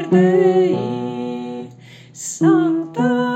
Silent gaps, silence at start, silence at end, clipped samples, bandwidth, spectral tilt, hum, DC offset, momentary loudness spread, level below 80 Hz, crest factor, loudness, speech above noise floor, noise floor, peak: none; 0 s; 0 s; under 0.1%; 9 kHz; -6.5 dB/octave; none; under 0.1%; 16 LU; -64 dBFS; 14 dB; -17 LUFS; 26 dB; -41 dBFS; -2 dBFS